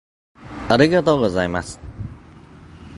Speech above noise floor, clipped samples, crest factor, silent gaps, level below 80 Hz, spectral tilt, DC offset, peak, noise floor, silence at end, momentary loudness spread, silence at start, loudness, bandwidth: 26 dB; under 0.1%; 22 dB; none; -42 dBFS; -6 dB/octave; under 0.1%; 0 dBFS; -43 dBFS; 0 s; 20 LU; 0.4 s; -18 LUFS; 11.5 kHz